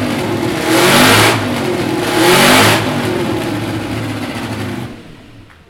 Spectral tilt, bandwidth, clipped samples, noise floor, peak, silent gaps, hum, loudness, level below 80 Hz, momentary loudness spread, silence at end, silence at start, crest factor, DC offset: -3.5 dB/octave; 19.5 kHz; under 0.1%; -38 dBFS; 0 dBFS; none; none; -12 LUFS; -40 dBFS; 14 LU; 0.3 s; 0 s; 14 dB; under 0.1%